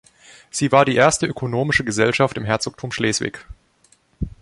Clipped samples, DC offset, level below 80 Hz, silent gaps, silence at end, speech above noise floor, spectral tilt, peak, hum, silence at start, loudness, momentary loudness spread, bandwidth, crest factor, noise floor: under 0.1%; under 0.1%; -42 dBFS; none; 0.15 s; 39 dB; -4.5 dB/octave; -2 dBFS; none; 0.55 s; -19 LUFS; 14 LU; 11.5 kHz; 20 dB; -58 dBFS